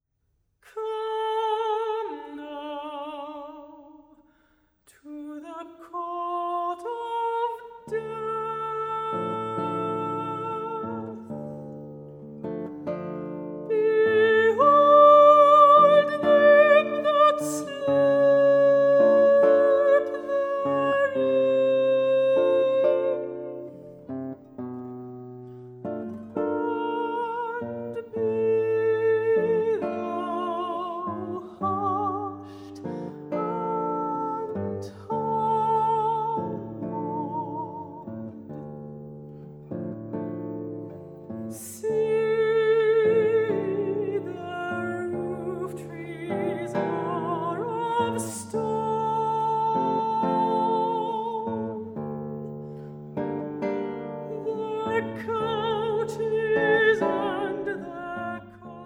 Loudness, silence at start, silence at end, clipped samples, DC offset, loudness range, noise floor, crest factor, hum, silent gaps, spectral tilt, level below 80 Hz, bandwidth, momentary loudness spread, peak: -24 LUFS; 0.75 s; 0 s; under 0.1%; under 0.1%; 16 LU; -72 dBFS; 20 dB; none; none; -6 dB/octave; -68 dBFS; 15 kHz; 20 LU; -6 dBFS